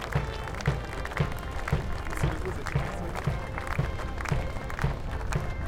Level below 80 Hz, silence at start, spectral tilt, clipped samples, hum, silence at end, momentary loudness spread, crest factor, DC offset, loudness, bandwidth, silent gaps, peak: -34 dBFS; 0 s; -6 dB/octave; under 0.1%; none; 0 s; 3 LU; 18 dB; under 0.1%; -32 LUFS; 17 kHz; none; -12 dBFS